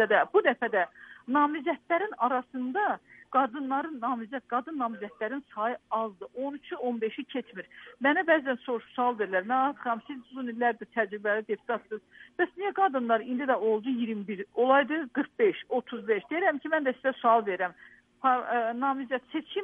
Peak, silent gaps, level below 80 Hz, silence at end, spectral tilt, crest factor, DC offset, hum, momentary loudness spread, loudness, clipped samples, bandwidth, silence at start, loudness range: -10 dBFS; none; -78 dBFS; 0 s; -7 dB/octave; 20 dB; under 0.1%; none; 11 LU; -29 LUFS; under 0.1%; 3.8 kHz; 0 s; 5 LU